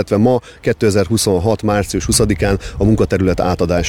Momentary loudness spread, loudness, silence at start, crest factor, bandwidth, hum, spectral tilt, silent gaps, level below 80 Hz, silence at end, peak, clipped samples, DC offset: 3 LU; -15 LUFS; 0 s; 14 dB; 16.5 kHz; none; -5.5 dB/octave; none; -30 dBFS; 0 s; -2 dBFS; under 0.1%; 0.3%